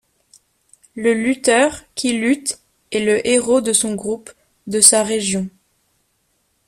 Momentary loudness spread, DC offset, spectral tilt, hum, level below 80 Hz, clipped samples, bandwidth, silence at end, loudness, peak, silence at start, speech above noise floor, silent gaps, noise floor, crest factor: 15 LU; under 0.1%; -2.5 dB/octave; none; -56 dBFS; under 0.1%; 15.5 kHz; 1.2 s; -16 LUFS; 0 dBFS; 0.95 s; 49 dB; none; -66 dBFS; 20 dB